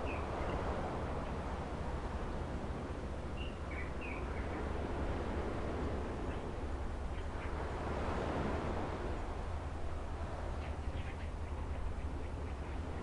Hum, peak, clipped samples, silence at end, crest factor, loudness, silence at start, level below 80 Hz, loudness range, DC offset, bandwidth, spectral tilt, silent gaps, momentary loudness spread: none; -26 dBFS; under 0.1%; 0 s; 14 dB; -41 LUFS; 0 s; -44 dBFS; 2 LU; under 0.1%; 11 kHz; -7 dB/octave; none; 5 LU